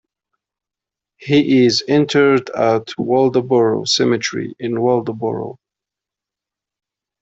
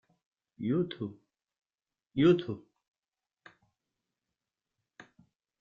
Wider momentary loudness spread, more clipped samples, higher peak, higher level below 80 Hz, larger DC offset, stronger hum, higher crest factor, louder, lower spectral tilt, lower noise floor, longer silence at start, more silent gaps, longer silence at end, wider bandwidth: second, 10 LU vs 16 LU; neither; first, -2 dBFS vs -14 dBFS; first, -60 dBFS vs -70 dBFS; neither; neither; second, 16 dB vs 22 dB; first, -16 LUFS vs -31 LUFS; second, -5 dB/octave vs -6.5 dB/octave; second, -86 dBFS vs under -90 dBFS; first, 1.2 s vs 0.6 s; neither; second, 1.7 s vs 3.05 s; first, 8 kHz vs 7 kHz